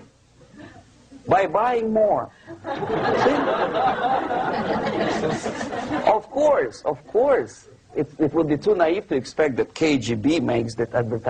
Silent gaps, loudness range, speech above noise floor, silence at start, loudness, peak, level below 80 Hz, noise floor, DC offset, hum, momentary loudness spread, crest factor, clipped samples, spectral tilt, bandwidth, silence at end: none; 1 LU; 31 dB; 0 s; -22 LUFS; -6 dBFS; -54 dBFS; -52 dBFS; under 0.1%; none; 9 LU; 16 dB; under 0.1%; -6 dB/octave; 9.6 kHz; 0 s